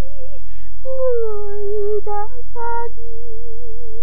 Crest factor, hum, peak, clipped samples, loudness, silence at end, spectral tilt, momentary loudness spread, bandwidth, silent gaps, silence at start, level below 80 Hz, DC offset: 14 dB; none; -4 dBFS; under 0.1%; -25 LUFS; 0 s; -9 dB/octave; 18 LU; 12.5 kHz; none; 0 s; -38 dBFS; 50%